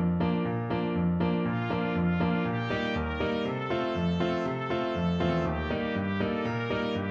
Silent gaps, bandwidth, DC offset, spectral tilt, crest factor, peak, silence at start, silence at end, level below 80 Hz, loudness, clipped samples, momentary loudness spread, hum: none; 7 kHz; under 0.1%; -8 dB/octave; 14 dB; -14 dBFS; 0 s; 0 s; -46 dBFS; -29 LUFS; under 0.1%; 3 LU; none